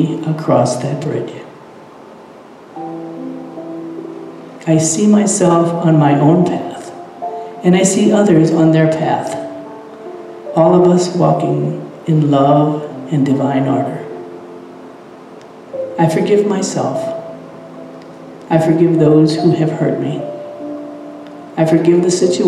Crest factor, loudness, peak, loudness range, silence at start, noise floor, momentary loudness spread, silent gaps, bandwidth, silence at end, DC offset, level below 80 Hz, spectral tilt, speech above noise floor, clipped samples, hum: 14 dB; -13 LUFS; 0 dBFS; 7 LU; 0 s; -37 dBFS; 21 LU; none; 12 kHz; 0 s; under 0.1%; -60 dBFS; -6.5 dB/octave; 25 dB; under 0.1%; none